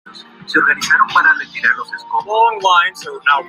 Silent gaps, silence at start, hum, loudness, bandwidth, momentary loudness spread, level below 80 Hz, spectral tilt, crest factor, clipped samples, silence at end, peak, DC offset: none; 0.05 s; none; -14 LUFS; 15.5 kHz; 8 LU; -66 dBFS; -1.5 dB/octave; 14 dB; under 0.1%; 0 s; 0 dBFS; under 0.1%